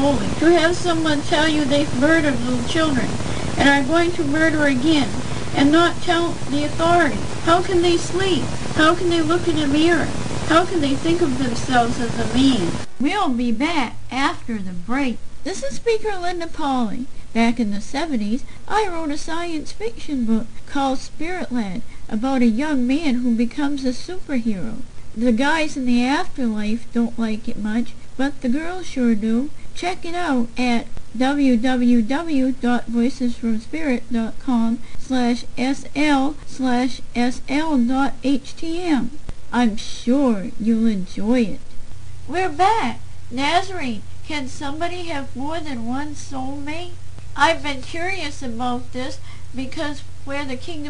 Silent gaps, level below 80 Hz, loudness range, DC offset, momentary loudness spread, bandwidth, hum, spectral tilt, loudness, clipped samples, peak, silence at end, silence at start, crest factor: none; -38 dBFS; 6 LU; 6%; 12 LU; 10 kHz; none; -5 dB/octave; -21 LUFS; under 0.1%; -2 dBFS; 0 s; 0 s; 18 dB